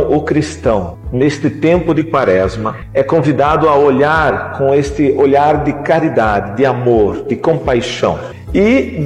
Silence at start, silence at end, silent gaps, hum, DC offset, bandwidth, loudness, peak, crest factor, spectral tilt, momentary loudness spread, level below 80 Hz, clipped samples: 0 s; 0 s; none; none; under 0.1%; 10.5 kHz; -13 LUFS; -2 dBFS; 12 dB; -7 dB/octave; 7 LU; -32 dBFS; under 0.1%